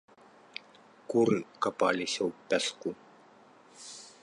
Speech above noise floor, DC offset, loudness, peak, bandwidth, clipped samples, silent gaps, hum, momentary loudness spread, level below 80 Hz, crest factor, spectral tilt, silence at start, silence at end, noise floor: 28 dB; under 0.1%; -30 LUFS; -14 dBFS; 11.5 kHz; under 0.1%; none; none; 18 LU; -74 dBFS; 20 dB; -4 dB/octave; 1.1 s; 0.15 s; -58 dBFS